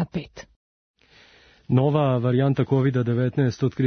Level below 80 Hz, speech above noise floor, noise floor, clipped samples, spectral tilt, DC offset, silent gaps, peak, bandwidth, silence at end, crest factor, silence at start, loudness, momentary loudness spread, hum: -56 dBFS; 34 dB; -54 dBFS; under 0.1%; -8.5 dB/octave; under 0.1%; 0.56-0.94 s; -6 dBFS; 6.4 kHz; 0 s; 16 dB; 0 s; -22 LUFS; 8 LU; none